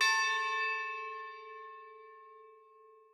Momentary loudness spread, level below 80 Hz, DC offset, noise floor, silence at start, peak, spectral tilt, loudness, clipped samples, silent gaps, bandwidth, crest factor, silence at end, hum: 25 LU; under -90 dBFS; under 0.1%; -61 dBFS; 0 s; -18 dBFS; 4.5 dB/octave; -33 LUFS; under 0.1%; none; 15.5 kHz; 20 dB; 0.25 s; none